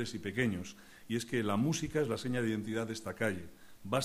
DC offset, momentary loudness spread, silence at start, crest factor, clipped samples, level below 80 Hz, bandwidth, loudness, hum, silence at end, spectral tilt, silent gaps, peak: under 0.1%; 13 LU; 0 s; 18 dB; under 0.1%; -62 dBFS; 15.5 kHz; -35 LUFS; none; 0 s; -5.5 dB/octave; none; -18 dBFS